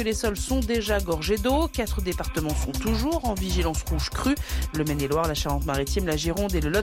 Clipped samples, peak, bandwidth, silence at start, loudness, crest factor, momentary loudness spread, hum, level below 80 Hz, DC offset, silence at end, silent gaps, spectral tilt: under 0.1%; -12 dBFS; 17 kHz; 0 s; -26 LUFS; 12 dB; 3 LU; none; -30 dBFS; under 0.1%; 0 s; none; -5 dB/octave